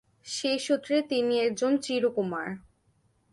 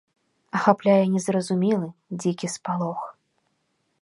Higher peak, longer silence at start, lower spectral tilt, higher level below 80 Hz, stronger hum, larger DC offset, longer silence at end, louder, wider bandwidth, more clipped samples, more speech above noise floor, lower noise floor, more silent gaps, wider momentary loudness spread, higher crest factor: second, -14 dBFS vs -2 dBFS; second, 0.25 s vs 0.55 s; second, -4 dB/octave vs -6 dB/octave; about the same, -70 dBFS vs -74 dBFS; neither; neither; second, 0.75 s vs 0.9 s; second, -28 LUFS vs -24 LUFS; about the same, 11.5 kHz vs 11.5 kHz; neither; second, 41 dB vs 49 dB; second, -68 dBFS vs -72 dBFS; neither; about the same, 10 LU vs 12 LU; second, 14 dB vs 22 dB